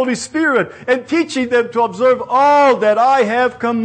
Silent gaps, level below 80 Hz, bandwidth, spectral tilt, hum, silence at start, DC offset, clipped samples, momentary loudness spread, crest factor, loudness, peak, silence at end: none; -58 dBFS; 9.6 kHz; -4.5 dB/octave; none; 0 s; under 0.1%; under 0.1%; 7 LU; 12 dB; -14 LUFS; -4 dBFS; 0 s